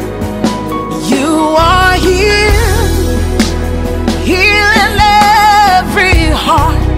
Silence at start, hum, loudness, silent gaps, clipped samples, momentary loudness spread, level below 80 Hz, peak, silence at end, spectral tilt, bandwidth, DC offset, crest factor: 0 s; none; -9 LUFS; none; under 0.1%; 9 LU; -18 dBFS; 0 dBFS; 0 s; -4.5 dB/octave; 16.5 kHz; under 0.1%; 10 dB